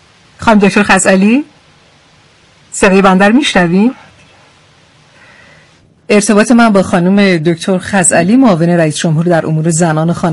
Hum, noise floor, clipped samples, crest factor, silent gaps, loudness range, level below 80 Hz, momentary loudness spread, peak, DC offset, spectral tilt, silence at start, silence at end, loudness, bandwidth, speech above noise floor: none; -45 dBFS; 0.3%; 10 dB; none; 4 LU; -42 dBFS; 6 LU; 0 dBFS; under 0.1%; -5 dB/octave; 0.4 s; 0 s; -9 LUFS; 12 kHz; 37 dB